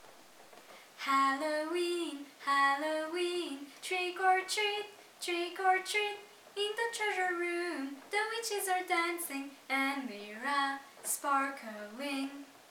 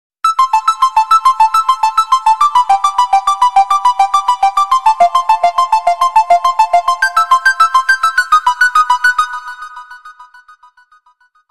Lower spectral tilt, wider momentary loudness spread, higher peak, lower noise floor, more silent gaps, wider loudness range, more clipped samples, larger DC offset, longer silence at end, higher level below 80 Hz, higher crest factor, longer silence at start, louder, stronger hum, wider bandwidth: first, -0.5 dB/octave vs 1.5 dB/octave; first, 13 LU vs 3 LU; second, -16 dBFS vs 0 dBFS; first, -57 dBFS vs -53 dBFS; neither; about the same, 2 LU vs 2 LU; neither; second, under 0.1% vs 1%; second, 0.1 s vs 1.25 s; second, under -90 dBFS vs -50 dBFS; first, 20 dB vs 10 dB; second, 0 s vs 0.25 s; second, -34 LUFS vs -11 LUFS; neither; first, 19.5 kHz vs 14 kHz